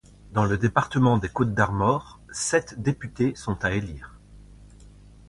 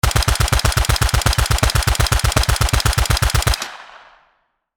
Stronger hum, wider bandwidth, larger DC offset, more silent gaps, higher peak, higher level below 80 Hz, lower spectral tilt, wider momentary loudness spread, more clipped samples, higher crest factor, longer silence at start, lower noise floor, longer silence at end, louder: neither; second, 11.5 kHz vs over 20 kHz; second, under 0.1% vs 0.2%; neither; second, -4 dBFS vs 0 dBFS; second, -46 dBFS vs -20 dBFS; first, -6 dB/octave vs -3 dB/octave; first, 9 LU vs 3 LU; neither; about the same, 22 dB vs 18 dB; first, 0.25 s vs 0.05 s; second, -49 dBFS vs -64 dBFS; second, 0.4 s vs 0.8 s; second, -25 LUFS vs -17 LUFS